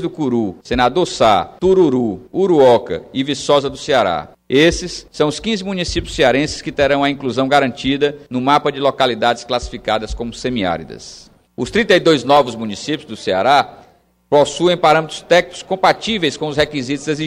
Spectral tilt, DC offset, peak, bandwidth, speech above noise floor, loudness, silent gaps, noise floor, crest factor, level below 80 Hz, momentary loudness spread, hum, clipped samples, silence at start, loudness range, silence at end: -4.5 dB/octave; under 0.1%; 0 dBFS; 15 kHz; 34 dB; -16 LUFS; none; -50 dBFS; 16 dB; -38 dBFS; 10 LU; none; under 0.1%; 0 s; 3 LU; 0 s